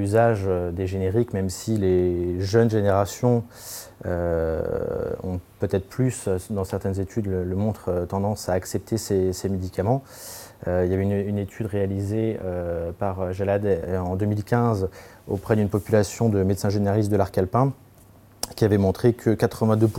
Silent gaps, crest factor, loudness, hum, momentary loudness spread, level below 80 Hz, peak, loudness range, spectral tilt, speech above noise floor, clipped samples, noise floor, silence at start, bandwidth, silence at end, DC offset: none; 18 dB; -24 LUFS; none; 8 LU; -50 dBFS; -6 dBFS; 4 LU; -7 dB/octave; 28 dB; under 0.1%; -51 dBFS; 0 s; 17 kHz; 0 s; under 0.1%